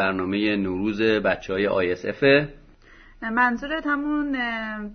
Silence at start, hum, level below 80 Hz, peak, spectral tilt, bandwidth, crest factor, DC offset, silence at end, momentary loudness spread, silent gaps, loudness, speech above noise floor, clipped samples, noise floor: 0 s; none; -50 dBFS; -4 dBFS; -6.5 dB/octave; 6.4 kHz; 18 dB; under 0.1%; 0 s; 8 LU; none; -23 LUFS; 27 dB; under 0.1%; -50 dBFS